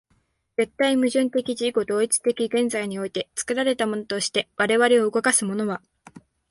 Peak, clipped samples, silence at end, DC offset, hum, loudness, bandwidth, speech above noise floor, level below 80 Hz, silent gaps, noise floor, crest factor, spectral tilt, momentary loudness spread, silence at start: -4 dBFS; under 0.1%; 0.3 s; under 0.1%; none; -23 LUFS; 11.5 kHz; 45 dB; -66 dBFS; none; -67 dBFS; 18 dB; -3 dB/octave; 9 LU; 0.6 s